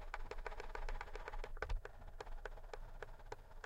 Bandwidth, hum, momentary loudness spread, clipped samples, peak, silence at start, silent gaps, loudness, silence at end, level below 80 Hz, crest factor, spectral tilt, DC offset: 8.4 kHz; none; 8 LU; under 0.1%; -26 dBFS; 0 s; none; -52 LUFS; 0 s; -48 dBFS; 20 dB; -4.5 dB/octave; under 0.1%